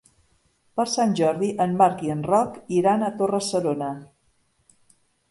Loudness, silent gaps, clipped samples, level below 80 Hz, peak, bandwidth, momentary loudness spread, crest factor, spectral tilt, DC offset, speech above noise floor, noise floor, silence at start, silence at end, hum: -23 LUFS; none; under 0.1%; -64 dBFS; -4 dBFS; 11.5 kHz; 8 LU; 20 dB; -5.5 dB/octave; under 0.1%; 44 dB; -66 dBFS; 0.75 s; 1.25 s; none